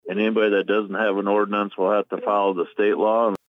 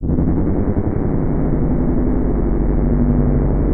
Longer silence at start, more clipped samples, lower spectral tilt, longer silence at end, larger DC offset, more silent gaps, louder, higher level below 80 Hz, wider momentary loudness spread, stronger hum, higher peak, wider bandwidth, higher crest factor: about the same, 0.05 s vs 0 s; neither; second, -7.5 dB/octave vs -14.5 dB/octave; first, 0.15 s vs 0 s; neither; neither; second, -21 LUFS vs -18 LUFS; second, -74 dBFS vs -20 dBFS; about the same, 4 LU vs 3 LU; neither; second, -10 dBFS vs -4 dBFS; first, 5.6 kHz vs 2.4 kHz; about the same, 12 dB vs 12 dB